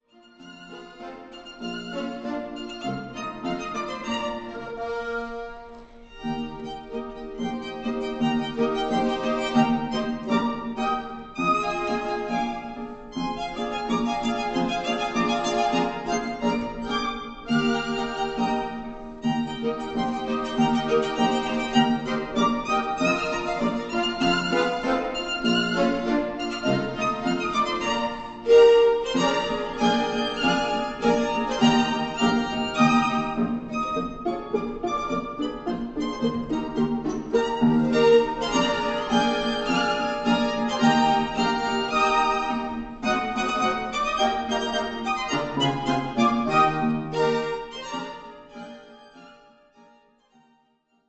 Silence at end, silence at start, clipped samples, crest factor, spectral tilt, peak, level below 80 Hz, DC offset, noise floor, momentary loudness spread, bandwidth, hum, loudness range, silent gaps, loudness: 1.75 s; 0.4 s; under 0.1%; 18 dB; -5 dB/octave; -6 dBFS; -48 dBFS; under 0.1%; -67 dBFS; 12 LU; 8.4 kHz; none; 10 LU; none; -25 LUFS